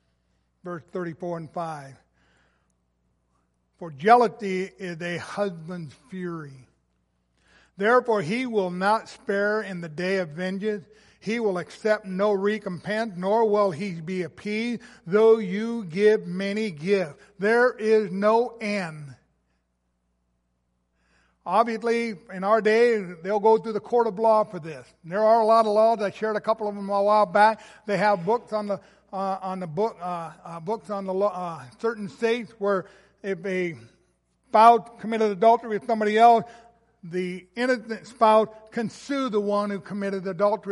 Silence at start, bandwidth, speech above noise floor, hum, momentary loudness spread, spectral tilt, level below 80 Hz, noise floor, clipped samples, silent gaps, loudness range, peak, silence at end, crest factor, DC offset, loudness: 0.65 s; 11.5 kHz; 50 dB; none; 16 LU; -6 dB/octave; -70 dBFS; -74 dBFS; under 0.1%; none; 8 LU; -4 dBFS; 0 s; 22 dB; under 0.1%; -24 LUFS